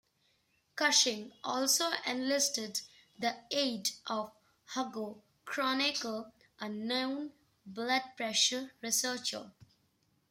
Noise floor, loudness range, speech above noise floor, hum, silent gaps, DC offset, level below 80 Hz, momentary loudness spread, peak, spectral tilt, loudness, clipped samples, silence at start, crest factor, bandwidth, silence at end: -74 dBFS; 5 LU; 40 dB; none; none; under 0.1%; -82 dBFS; 15 LU; -14 dBFS; -0.5 dB/octave; -33 LUFS; under 0.1%; 0.75 s; 22 dB; 16 kHz; 0.8 s